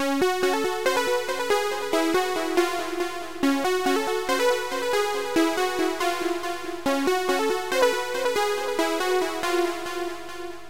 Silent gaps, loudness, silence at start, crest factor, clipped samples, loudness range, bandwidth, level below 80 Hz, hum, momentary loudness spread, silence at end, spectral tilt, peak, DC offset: none; -24 LUFS; 0 s; 14 dB; under 0.1%; 1 LU; 16 kHz; -60 dBFS; 50 Hz at -60 dBFS; 6 LU; 0 s; -2.5 dB/octave; -10 dBFS; 1%